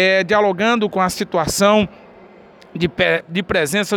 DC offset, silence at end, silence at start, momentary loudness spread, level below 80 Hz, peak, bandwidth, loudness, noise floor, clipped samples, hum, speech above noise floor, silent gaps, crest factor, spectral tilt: under 0.1%; 0 s; 0 s; 8 LU; -48 dBFS; -4 dBFS; 19 kHz; -17 LUFS; -44 dBFS; under 0.1%; none; 27 dB; none; 14 dB; -4 dB/octave